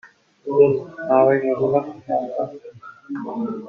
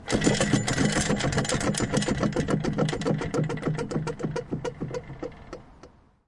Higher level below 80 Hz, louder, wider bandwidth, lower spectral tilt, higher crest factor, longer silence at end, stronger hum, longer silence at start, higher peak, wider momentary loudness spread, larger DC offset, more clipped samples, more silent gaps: second, -64 dBFS vs -44 dBFS; first, -20 LUFS vs -27 LUFS; second, 4.3 kHz vs 11.5 kHz; first, -9.5 dB/octave vs -5 dB/octave; about the same, 18 dB vs 20 dB; second, 0 s vs 0.4 s; neither; about the same, 0.05 s vs 0 s; first, -2 dBFS vs -8 dBFS; first, 17 LU vs 14 LU; neither; neither; neither